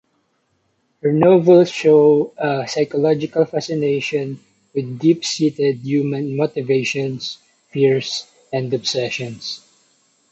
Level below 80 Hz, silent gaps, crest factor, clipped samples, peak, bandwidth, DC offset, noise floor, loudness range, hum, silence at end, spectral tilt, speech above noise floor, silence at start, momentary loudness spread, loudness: -64 dBFS; none; 16 dB; under 0.1%; -2 dBFS; 8.4 kHz; under 0.1%; -66 dBFS; 6 LU; none; 0.75 s; -5.5 dB/octave; 49 dB; 1.05 s; 15 LU; -18 LUFS